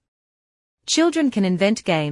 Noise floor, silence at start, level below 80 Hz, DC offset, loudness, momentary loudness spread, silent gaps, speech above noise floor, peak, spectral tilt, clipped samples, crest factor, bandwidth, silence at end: under -90 dBFS; 0.85 s; -64 dBFS; under 0.1%; -19 LUFS; 4 LU; none; over 71 dB; -4 dBFS; -4.5 dB/octave; under 0.1%; 18 dB; 11 kHz; 0 s